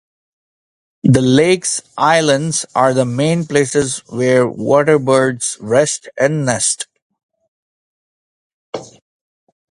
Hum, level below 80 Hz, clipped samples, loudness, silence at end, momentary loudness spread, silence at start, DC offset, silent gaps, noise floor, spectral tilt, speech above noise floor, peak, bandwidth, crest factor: none; -52 dBFS; under 0.1%; -14 LUFS; 0.85 s; 9 LU; 1.05 s; under 0.1%; 7.02-7.10 s, 7.23-7.29 s, 7.48-8.73 s; under -90 dBFS; -4.5 dB/octave; over 76 dB; 0 dBFS; 11.5 kHz; 16 dB